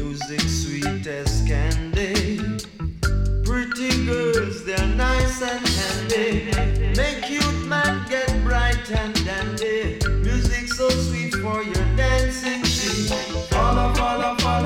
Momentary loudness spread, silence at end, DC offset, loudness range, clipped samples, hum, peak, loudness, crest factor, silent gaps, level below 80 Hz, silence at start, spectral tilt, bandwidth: 4 LU; 0 s; under 0.1%; 2 LU; under 0.1%; none; -10 dBFS; -22 LUFS; 12 dB; none; -26 dBFS; 0 s; -4.5 dB/octave; 16 kHz